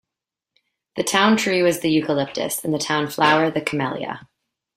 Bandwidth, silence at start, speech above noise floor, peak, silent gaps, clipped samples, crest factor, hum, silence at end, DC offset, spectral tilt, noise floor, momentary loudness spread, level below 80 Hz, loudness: 16 kHz; 0.95 s; 66 dB; -2 dBFS; none; under 0.1%; 20 dB; none; 0.55 s; under 0.1%; -4 dB/octave; -86 dBFS; 11 LU; -62 dBFS; -20 LUFS